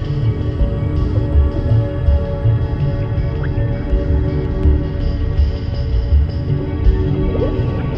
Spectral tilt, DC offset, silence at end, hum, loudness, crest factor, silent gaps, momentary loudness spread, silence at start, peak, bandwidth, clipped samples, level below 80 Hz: -10 dB/octave; under 0.1%; 0 s; none; -18 LUFS; 14 dB; none; 4 LU; 0 s; -2 dBFS; 5.6 kHz; under 0.1%; -18 dBFS